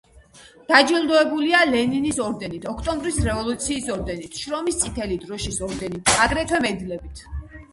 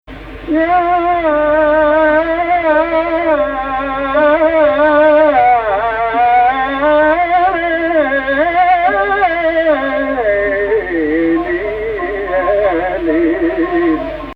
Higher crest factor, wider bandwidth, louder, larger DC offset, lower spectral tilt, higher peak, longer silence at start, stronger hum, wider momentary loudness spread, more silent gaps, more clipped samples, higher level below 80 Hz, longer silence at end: first, 22 dB vs 12 dB; first, 11.5 kHz vs 5.2 kHz; second, -21 LUFS vs -13 LUFS; neither; second, -3.5 dB/octave vs -7.5 dB/octave; about the same, 0 dBFS vs 0 dBFS; about the same, 0.15 s vs 0.1 s; neither; first, 13 LU vs 6 LU; neither; neither; about the same, -38 dBFS vs -36 dBFS; about the same, 0.1 s vs 0 s